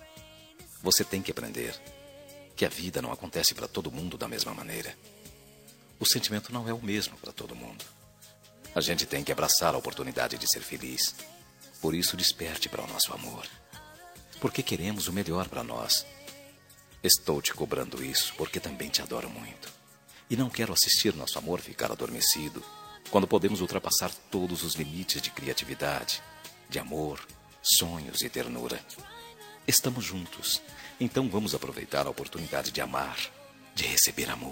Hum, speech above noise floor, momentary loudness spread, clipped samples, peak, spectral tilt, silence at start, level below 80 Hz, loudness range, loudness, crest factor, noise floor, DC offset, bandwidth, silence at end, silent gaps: none; 25 dB; 20 LU; under 0.1%; -4 dBFS; -2.5 dB/octave; 0 s; -60 dBFS; 4 LU; -29 LUFS; 26 dB; -56 dBFS; under 0.1%; 16.5 kHz; 0 s; none